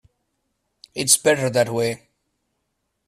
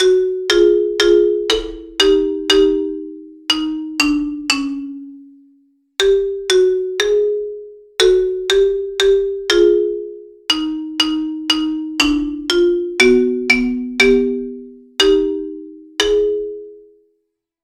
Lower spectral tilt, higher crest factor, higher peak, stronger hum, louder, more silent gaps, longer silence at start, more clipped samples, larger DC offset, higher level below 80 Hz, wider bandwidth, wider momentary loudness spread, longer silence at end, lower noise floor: about the same, -2.5 dB/octave vs -2 dB/octave; first, 24 dB vs 16 dB; about the same, 0 dBFS vs 0 dBFS; neither; second, -19 LUFS vs -16 LUFS; neither; first, 0.95 s vs 0 s; neither; neither; second, -62 dBFS vs -42 dBFS; about the same, 15.5 kHz vs 15.5 kHz; about the same, 16 LU vs 14 LU; first, 1.1 s vs 0.85 s; first, -75 dBFS vs -71 dBFS